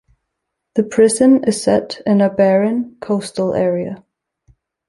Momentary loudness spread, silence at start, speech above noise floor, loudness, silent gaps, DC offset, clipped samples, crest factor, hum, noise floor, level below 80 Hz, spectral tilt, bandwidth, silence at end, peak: 11 LU; 0.75 s; 62 dB; -16 LUFS; none; under 0.1%; under 0.1%; 14 dB; none; -77 dBFS; -56 dBFS; -5.5 dB/octave; 11.5 kHz; 0.9 s; -2 dBFS